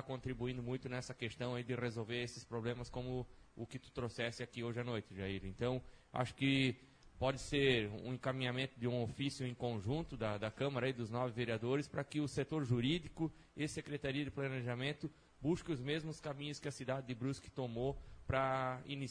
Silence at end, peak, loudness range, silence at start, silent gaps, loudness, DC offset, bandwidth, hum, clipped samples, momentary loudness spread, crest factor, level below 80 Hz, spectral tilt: 0 s; -20 dBFS; 6 LU; 0 s; none; -41 LUFS; under 0.1%; 10.5 kHz; none; under 0.1%; 9 LU; 20 dB; -60 dBFS; -6 dB/octave